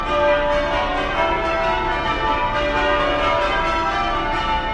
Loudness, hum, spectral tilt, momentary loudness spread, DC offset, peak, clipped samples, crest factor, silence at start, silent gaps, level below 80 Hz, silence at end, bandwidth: -19 LUFS; none; -5 dB/octave; 3 LU; under 0.1%; -4 dBFS; under 0.1%; 14 dB; 0 s; none; -30 dBFS; 0 s; 10 kHz